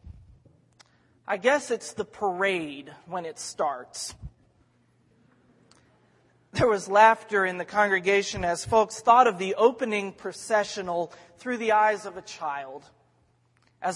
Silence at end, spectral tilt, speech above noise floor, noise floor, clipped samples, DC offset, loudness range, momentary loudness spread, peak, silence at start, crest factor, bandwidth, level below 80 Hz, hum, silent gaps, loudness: 0 s; -3.5 dB/octave; 41 dB; -66 dBFS; under 0.1%; under 0.1%; 13 LU; 18 LU; -4 dBFS; 0.05 s; 22 dB; 11.5 kHz; -58 dBFS; none; none; -25 LUFS